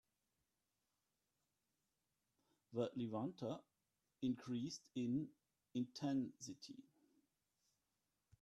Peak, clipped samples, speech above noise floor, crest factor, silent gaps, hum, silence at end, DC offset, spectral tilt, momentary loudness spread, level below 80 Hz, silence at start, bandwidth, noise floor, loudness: -28 dBFS; under 0.1%; 45 dB; 20 dB; none; none; 1.6 s; under 0.1%; -6 dB/octave; 11 LU; -86 dBFS; 2.7 s; 11.5 kHz; -90 dBFS; -46 LUFS